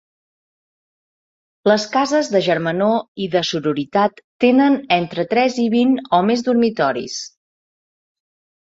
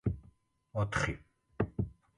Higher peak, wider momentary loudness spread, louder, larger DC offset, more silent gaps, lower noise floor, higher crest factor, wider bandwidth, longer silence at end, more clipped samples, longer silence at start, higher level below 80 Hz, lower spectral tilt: first, -2 dBFS vs -16 dBFS; second, 6 LU vs 12 LU; first, -18 LUFS vs -37 LUFS; neither; first, 3.08-3.15 s, 4.24-4.40 s vs none; first, under -90 dBFS vs -64 dBFS; about the same, 18 dB vs 20 dB; second, 7.8 kHz vs 11 kHz; first, 1.35 s vs 0.25 s; neither; first, 1.65 s vs 0.05 s; second, -62 dBFS vs -50 dBFS; about the same, -5 dB/octave vs -6 dB/octave